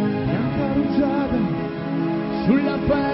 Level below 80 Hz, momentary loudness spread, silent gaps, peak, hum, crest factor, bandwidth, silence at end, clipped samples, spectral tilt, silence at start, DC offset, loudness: -40 dBFS; 5 LU; none; -6 dBFS; none; 14 dB; 5.8 kHz; 0 s; under 0.1%; -12.5 dB/octave; 0 s; under 0.1%; -22 LUFS